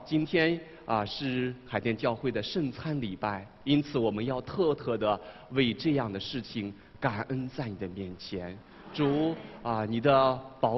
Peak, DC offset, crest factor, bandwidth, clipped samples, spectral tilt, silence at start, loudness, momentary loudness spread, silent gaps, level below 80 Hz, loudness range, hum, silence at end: -10 dBFS; under 0.1%; 22 dB; 6 kHz; under 0.1%; -7.5 dB/octave; 0 s; -31 LUFS; 11 LU; none; -58 dBFS; 4 LU; none; 0 s